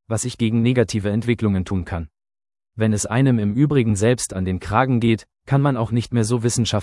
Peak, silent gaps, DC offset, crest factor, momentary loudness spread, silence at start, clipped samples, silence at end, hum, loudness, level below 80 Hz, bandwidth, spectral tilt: -2 dBFS; none; under 0.1%; 18 dB; 7 LU; 0.1 s; under 0.1%; 0 s; none; -20 LUFS; -46 dBFS; 12 kHz; -6 dB/octave